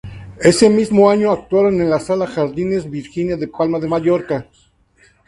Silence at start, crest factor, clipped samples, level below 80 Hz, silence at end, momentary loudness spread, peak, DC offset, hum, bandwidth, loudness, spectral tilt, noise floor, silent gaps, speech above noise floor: 0.05 s; 16 dB; under 0.1%; -46 dBFS; 0.85 s; 11 LU; 0 dBFS; under 0.1%; none; 11.5 kHz; -16 LUFS; -6 dB/octave; -54 dBFS; none; 39 dB